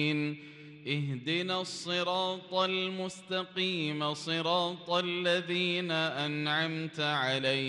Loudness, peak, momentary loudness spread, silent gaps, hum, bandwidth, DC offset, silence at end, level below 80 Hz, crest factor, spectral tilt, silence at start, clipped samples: -31 LUFS; -16 dBFS; 6 LU; none; none; 11.5 kHz; under 0.1%; 0 s; -78 dBFS; 18 dB; -4.5 dB/octave; 0 s; under 0.1%